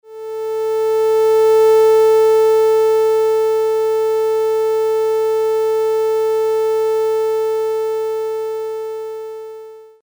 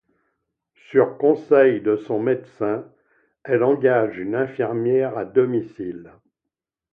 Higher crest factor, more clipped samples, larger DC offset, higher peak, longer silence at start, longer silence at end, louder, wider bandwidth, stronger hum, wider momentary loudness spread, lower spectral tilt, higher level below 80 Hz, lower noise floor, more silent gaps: second, 8 dB vs 18 dB; neither; neither; about the same, -6 dBFS vs -4 dBFS; second, 0.1 s vs 0.9 s; second, 0.2 s vs 0.85 s; first, -15 LUFS vs -20 LUFS; first, over 20 kHz vs 3.7 kHz; first, 60 Hz at -60 dBFS vs none; about the same, 14 LU vs 13 LU; second, -2.5 dB/octave vs -9.5 dB/octave; about the same, -64 dBFS vs -66 dBFS; second, -36 dBFS vs -84 dBFS; neither